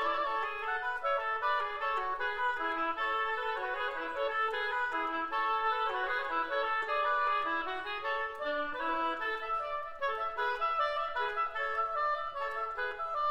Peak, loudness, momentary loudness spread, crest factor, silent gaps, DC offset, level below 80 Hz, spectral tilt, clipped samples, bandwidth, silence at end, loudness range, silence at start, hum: -20 dBFS; -33 LUFS; 4 LU; 14 dB; none; under 0.1%; -62 dBFS; -3 dB/octave; under 0.1%; 15.5 kHz; 0 s; 2 LU; 0 s; none